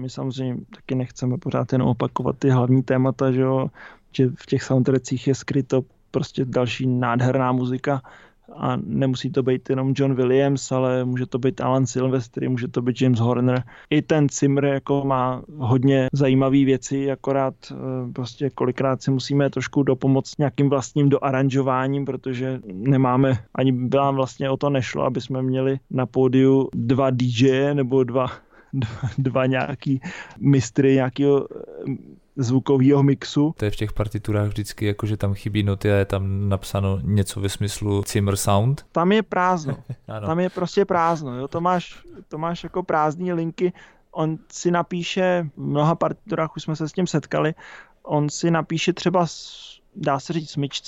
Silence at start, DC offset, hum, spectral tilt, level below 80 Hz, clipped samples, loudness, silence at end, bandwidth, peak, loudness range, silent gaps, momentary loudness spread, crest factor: 0 s; under 0.1%; none; -6.5 dB/octave; -48 dBFS; under 0.1%; -22 LUFS; 0 s; 16 kHz; -6 dBFS; 3 LU; none; 9 LU; 14 dB